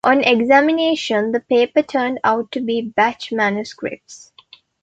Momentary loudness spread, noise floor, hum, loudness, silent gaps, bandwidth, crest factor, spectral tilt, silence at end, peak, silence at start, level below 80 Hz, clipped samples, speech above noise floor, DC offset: 12 LU; -49 dBFS; none; -17 LUFS; none; 8.8 kHz; 16 dB; -4.5 dB/octave; 0.65 s; -2 dBFS; 0.05 s; -60 dBFS; under 0.1%; 31 dB; under 0.1%